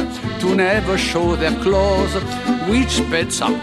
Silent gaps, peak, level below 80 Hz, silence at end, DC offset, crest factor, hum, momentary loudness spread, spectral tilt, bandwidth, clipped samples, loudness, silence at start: none; -2 dBFS; -30 dBFS; 0 s; under 0.1%; 16 dB; none; 5 LU; -4.5 dB/octave; 14 kHz; under 0.1%; -18 LUFS; 0 s